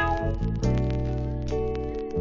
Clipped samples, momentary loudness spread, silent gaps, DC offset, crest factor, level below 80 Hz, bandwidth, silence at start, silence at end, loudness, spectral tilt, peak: under 0.1%; 5 LU; none; under 0.1%; 14 dB; -32 dBFS; 7.4 kHz; 0 s; 0 s; -28 LUFS; -8 dB/octave; -12 dBFS